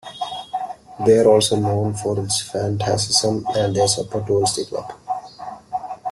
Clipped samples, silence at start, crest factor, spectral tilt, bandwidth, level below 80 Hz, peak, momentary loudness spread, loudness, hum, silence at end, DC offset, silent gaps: under 0.1%; 0.05 s; 18 dB; -4.5 dB/octave; 12.5 kHz; -54 dBFS; -2 dBFS; 15 LU; -20 LUFS; none; 0 s; under 0.1%; none